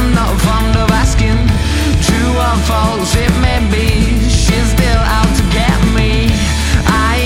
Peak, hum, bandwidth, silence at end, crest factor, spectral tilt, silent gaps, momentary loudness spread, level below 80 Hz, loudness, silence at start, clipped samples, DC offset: 0 dBFS; none; 16.5 kHz; 0 s; 10 dB; -5 dB/octave; none; 1 LU; -14 dBFS; -12 LUFS; 0 s; under 0.1%; under 0.1%